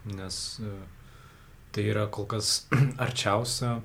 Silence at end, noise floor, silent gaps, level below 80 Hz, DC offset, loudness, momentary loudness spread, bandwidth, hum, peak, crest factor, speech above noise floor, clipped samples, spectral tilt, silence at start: 0 s; -51 dBFS; none; -54 dBFS; under 0.1%; -28 LUFS; 13 LU; 16.5 kHz; none; -8 dBFS; 22 dB; 23 dB; under 0.1%; -4 dB/octave; 0 s